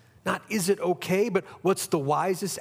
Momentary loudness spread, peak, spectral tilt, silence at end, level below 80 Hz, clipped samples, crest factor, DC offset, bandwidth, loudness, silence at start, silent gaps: 3 LU; -10 dBFS; -4.5 dB/octave; 0 s; -72 dBFS; under 0.1%; 16 dB; under 0.1%; 16.5 kHz; -27 LUFS; 0.25 s; none